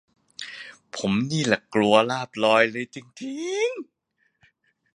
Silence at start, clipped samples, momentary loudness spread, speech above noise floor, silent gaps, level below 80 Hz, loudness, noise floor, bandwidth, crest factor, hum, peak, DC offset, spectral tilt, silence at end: 0.4 s; under 0.1%; 18 LU; 44 dB; none; -64 dBFS; -23 LUFS; -67 dBFS; 11 kHz; 22 dB; none; -2 dBFS; under 0.1%; -4.5 dB/octave; 1.1 s